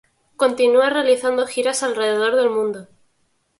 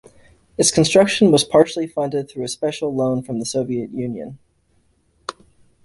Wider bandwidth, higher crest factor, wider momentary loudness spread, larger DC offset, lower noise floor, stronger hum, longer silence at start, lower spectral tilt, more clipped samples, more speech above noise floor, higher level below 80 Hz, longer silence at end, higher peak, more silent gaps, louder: about the same, 11.5 kHz vs 12 kHz; about the same, 14 dB vs 18 dB; second, 7 LU vs 20 LU; neither; first, -66 dBFS vs -61 dBFS; neither; second, 0.4 s vs 0.6 s; second, -2.5 dB/octave vs -4.5 dB/octave; neither; first, 48 dB vs 43 dB; second, -68 dBFS vs -54 dBFS; first, 0.75 s vs 0.55 s; about the same, -4 dBFS vs -2 dBFS; neither; about the same, -18 LUFS vs -18 LUFS